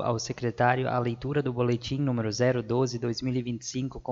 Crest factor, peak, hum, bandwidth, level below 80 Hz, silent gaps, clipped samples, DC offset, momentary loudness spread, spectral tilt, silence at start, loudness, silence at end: 18 dB; -10 dBFS; none; 7.6 kHz; -54 dBFS; none; under 0.1%; under 0.1%; 7 LU; -6 dB/octave; 0 s; -28 LUFS; 0 s